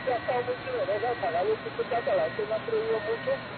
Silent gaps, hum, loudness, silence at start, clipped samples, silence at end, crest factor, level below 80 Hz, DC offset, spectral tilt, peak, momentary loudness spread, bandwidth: none; none; -29 LUFS; 0 s; under 0.1%; 0 s; 12 dB; -60 dBFS; under 0.1%; -9 dB/octave; -16 dBFS; 3 LU; 4.6 kHz